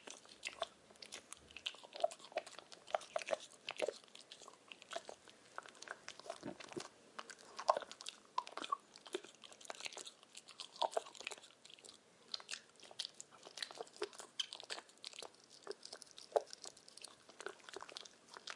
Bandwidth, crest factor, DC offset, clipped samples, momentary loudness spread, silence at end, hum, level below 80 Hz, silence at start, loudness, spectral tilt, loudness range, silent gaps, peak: 11.5 kHz; 34 dB; under 0.1%; under 0.1%; 15 LU; 0 s; none; under -90 dBFS; 0 s; -47 LUFS; -1 dB/octave; 4 LU; none; -14 dBFS